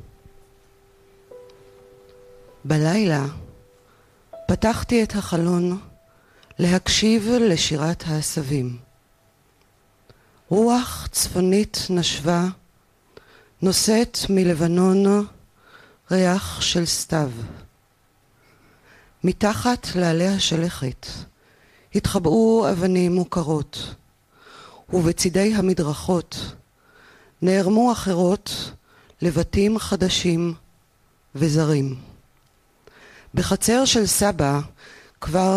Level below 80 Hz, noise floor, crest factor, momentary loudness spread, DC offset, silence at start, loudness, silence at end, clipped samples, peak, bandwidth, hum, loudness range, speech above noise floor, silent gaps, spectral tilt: -44 dBFS; -61 dBFS; 16 dB; 13 LU; under 0.1%; 1.3 s; -21 LUFS; 0 s; under 0.1%; -6 dBFS; 15.5 kHz; none; 5 LU; 41 dB; none; -5 dB/octave